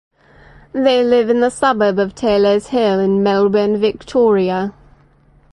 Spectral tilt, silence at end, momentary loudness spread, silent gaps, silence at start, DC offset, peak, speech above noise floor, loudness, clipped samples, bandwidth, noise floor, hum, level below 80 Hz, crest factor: -6 dB/octave; 0.8 s; 5 LU; none; 0.75 s; under 0.1%; -2 dBFS; 36 dB; -15 LUFS; under 0.1%; 11 kHz; -50 dBFS; none; -48 dBFS; 14 dB